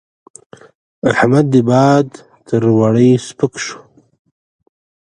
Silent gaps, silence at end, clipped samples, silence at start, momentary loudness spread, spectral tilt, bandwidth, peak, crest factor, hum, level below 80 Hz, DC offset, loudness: none; 1.3 s; under 0.1%; 1.05 s; 13 LU; -7 dB/octave; 10.5 kHz; 0 dBFS; 14 dB; none; -54 dBFS; under 0.1%; -13 LUFS